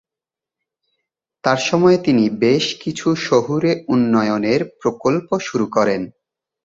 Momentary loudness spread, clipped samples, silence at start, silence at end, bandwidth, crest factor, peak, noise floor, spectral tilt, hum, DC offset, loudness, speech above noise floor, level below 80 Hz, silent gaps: 7 LU; under 0.1%; 1.45 s; 0.55 s; 7.8 kHz; 16 dB; -2 dBFS; -88 dBFS; -5.5 dB/octave; none; under 0.1%; -18 LUFS; 71 dB; -58 dBFS; none